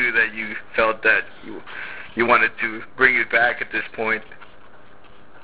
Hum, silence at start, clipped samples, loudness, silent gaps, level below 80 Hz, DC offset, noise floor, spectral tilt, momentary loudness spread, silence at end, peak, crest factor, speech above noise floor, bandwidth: none; 0 s; under 0.1%; -19 LUFS; none; -54 dBFS; 1%; -49 dBFS; -7 dB/octave; 16 LU; 1 s; 0 dBFS; 22 dB; 29 dB; 4 kHz